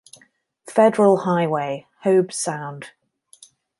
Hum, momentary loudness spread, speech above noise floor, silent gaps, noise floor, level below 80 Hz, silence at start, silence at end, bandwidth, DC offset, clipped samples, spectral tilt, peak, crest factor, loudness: none; 15 LU; 39 dB; none; -58 dBFS; -72 dBFS; 0.65 s; 0.9 s; 11.5 kHz; under 0.1%; under 0.1%; -5.5 dB/octave; -2 dBFS; 18 dB; -20 LUFS